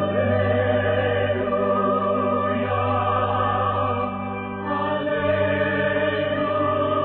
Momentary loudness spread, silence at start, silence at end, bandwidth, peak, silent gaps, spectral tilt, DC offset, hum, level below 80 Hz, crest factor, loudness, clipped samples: 4 LU; 0 s; 0 s; 4.3 kHz; -10 dBFS; none; -11 dB/octave; under 0.1%; 50 Hz at -50 dBFS; -52 dBFS; 12 dB; -22 LUFS; under 0.1%